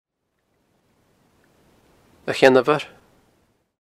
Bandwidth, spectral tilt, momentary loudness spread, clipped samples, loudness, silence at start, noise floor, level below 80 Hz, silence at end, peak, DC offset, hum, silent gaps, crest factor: 15 kHz; -5 dB/octave; 20 LU; under 0.1%; -18 LUFS; 2.25 s; -73 dBFS; -66 dBFS; 0.95 s; 0 dBFS; under 0.1%; none; none; 24 dB